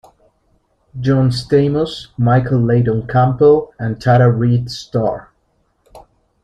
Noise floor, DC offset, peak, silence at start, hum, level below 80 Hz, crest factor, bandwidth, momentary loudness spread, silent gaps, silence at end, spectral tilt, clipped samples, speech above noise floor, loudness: -62 dBFS; under 0.1%; -2 dBFS; 0.95 s; none; -44 dBFS; 14 dB; 9.8 kHz; 10 LU; none; 0.45 s; -8 dB/octave; under 0.1%; 48 dB; -15 LUFS